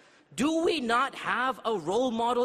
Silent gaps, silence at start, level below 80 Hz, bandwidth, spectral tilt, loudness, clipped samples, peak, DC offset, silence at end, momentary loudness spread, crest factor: none; 0.3 s; -64 dBFS; 14 kHz; -4 dB/octave; -28 LUFS; under 0.1%; -12 dBFS; under 0.1%; 0 s; 5 LU; 16 dB